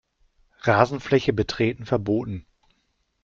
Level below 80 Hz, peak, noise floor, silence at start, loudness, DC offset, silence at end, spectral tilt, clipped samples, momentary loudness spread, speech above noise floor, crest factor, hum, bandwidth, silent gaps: -50 dBFS; -2 dBFS; -71 dBFS; 0.65 s; -23 LUFS; under 0.1%; 0.85 s; -7 dB/octave; under 0.1%; 8 LU; 49 dB; 22 dB; none; 7.6 kHz; none